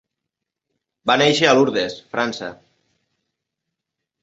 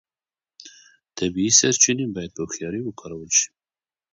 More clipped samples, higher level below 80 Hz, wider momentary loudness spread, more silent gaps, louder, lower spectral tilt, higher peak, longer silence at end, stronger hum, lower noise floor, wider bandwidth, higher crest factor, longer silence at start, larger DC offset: neither; second, -64 dBFS vs -56 dBFS; about the same, 14 LU vs 16 LU; neither; about the same, -18 LUFS vs -20 LUFS; first, -4 dB/octave vs -2 dB/octave; about the same, -2 dBFS vs -2 dBFS; first, 1.7 s vs 0.65 s; neither; second, -82 dBFS vs under -90 dBFS; about the same, 8 kHz vs 8 kHz; about the same, 22 dB vs 22 dB; first, 1.05 s vs 0.6 s; neither